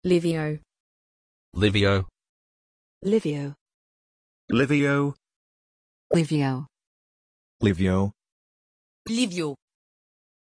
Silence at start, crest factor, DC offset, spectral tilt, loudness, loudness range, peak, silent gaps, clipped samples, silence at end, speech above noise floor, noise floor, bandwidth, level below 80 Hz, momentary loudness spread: 0.05 s; 20 dB; under 0.1%; -6.5 dB/octave; -25 LUFS; 2 LU; -8 dBFS; 0.80-1.52 s, 2.29-3.01 s, 3.61-3.66 s, 3.74-4.48 s, 5.36-6.10 s, 6.87-7.60 s, 8.32-9.05 s; under 0.1%; 0.9 s; over 67 dB; under -90 dBFS; 11 kHz; -52 dBFS; 16 LU